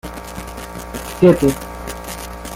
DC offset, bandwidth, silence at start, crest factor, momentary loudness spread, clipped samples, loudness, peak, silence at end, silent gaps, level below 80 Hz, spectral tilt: under 0.1%; 16.5 kHz; 0.05 s; 18 dB; 18 LU; under 0.1%; -18 LUFS; -2 dBFS; 0 s; none; -36 dBFS; -6 dB/octave